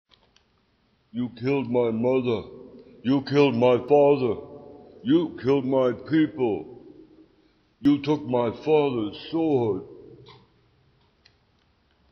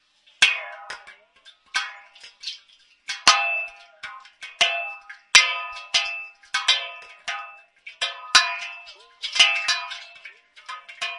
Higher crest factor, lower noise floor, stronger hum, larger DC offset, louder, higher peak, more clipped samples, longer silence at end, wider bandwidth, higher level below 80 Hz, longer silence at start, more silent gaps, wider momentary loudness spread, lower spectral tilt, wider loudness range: second, 18 dB vs 26 dB; first, -66 dBFS vs -56 dBFS; neither; neither; second, -24 LUFS vs -20 LUFS; second, -6 dBFS vs 0 dBFS; neither; first, 1.95 s vs 0 s; second, 6.4 kHz vs 12 kHz; first, -62 dBFS vs -68 dBFS; first, 1.15 s vs 0.4 s; neither; second, 14 LU vs 22 LU; first, -6 dB/octave vs 2.5 dB/octave; about the same, 5 LU vs 4 LU